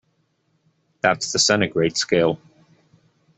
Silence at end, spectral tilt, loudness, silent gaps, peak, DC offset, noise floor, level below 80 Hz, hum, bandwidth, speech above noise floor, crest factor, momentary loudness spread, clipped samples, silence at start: 1 s; -3 dB/octave; -19 LUFS; none; -2 dBFS; under 0.1%; -68 dBFS; -58 dBFS; none; 8.4 kHz; 48 dB; 20 dB; 6 LU; under 0.1%; 1.05 s